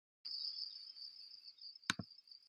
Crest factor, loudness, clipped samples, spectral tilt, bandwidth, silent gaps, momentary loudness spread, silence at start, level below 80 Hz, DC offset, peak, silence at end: 34 dB; -46 LUFS; under 0.1%; -1.5 dB/octave; 15 kHz; none; 11 LU; 0.25 s; -86 dBFS; under 0.1%; -16 dBFS; 0 s